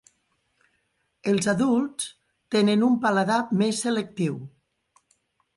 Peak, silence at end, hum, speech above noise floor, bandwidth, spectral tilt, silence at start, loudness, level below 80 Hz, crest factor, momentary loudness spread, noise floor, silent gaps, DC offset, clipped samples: -10 dBFS; 1.1 s; none; 50 dB; 11.5 kHz; -5 dB/octave; 1.25 s; -24 LUFS; -68 dBFS; 16 dB; 11 LU; -72 dBFS; none; under 0.1%; under 0.1%